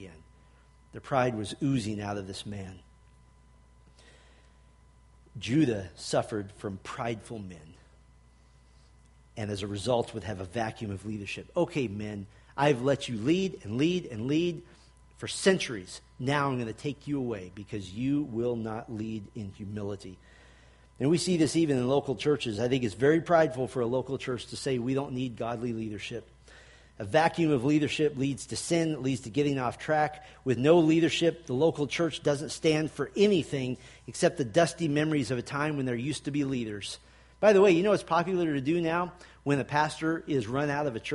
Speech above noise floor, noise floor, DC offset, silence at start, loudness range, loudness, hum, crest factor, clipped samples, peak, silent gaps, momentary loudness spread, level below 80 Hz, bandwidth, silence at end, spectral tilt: 30 dB; -59 dBFS; under 0.1%; 0 s; 9 LU; -29 LUFS; none; 22 dB; under 0.1%; -8 dBFS; none; 14 LU; -58 dBFS; 11.5 kHz; 0 s; -5.5 dB/octave